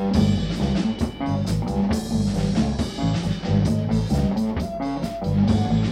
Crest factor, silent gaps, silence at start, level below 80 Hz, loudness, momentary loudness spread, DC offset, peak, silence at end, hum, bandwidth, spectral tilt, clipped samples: 14 dB; none; 0 s; -34 dBFS; -23 LUFS; 6 LU; under 0.1%; -8 dBFS; 0 s; none; 14.5 kHz; -7 dB/octave; under 0.1%